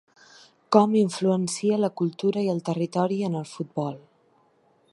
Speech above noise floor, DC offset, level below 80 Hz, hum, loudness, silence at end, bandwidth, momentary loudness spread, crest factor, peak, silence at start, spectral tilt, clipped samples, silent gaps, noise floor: 39 dB; under 0.1%; -74 dBFS; none; -25 LUFS; 0.95 s; 11.5 kHz; 11 LU; 22 dB; -2 dBFS; 0.7 s; -6.5 dB/octave; under 0.1%; none; -63 dBFS